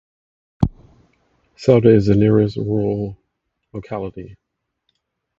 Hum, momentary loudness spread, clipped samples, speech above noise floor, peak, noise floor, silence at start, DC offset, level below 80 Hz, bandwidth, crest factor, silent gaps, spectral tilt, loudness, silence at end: none; 19 LU; under 0.1%; 58 dB; 0 dBFS; -74 dBFS; 0.6 s; under 0.1%; -40 dBFS; 7.6 kHz; 20 dB; none; -9 dB/octave; -17 LUFS; 1.05 s